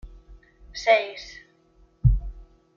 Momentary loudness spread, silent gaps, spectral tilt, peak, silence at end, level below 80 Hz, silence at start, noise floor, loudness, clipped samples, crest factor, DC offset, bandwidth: 22 LU; none; -6 dB/octave; -6 dBFS; 0.35 s; -32 dBFS; 0.05 s; -59 dBFS; -24 LUFS; under 0.1%; 20 dB; under 0.1%; 7.2 kHz